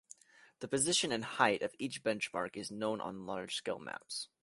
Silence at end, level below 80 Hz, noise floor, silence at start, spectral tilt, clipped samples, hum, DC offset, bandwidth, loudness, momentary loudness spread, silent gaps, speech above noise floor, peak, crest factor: 0.15 s; -74 dBFS; -60 dBFS; 0.6 s; -2.5 dB/octave; under 0.1%; none; under 0.1%; 11.5 kHz; -36 LUFS; 12 LU; none; 23 dB; -12 dBFS; 26 dB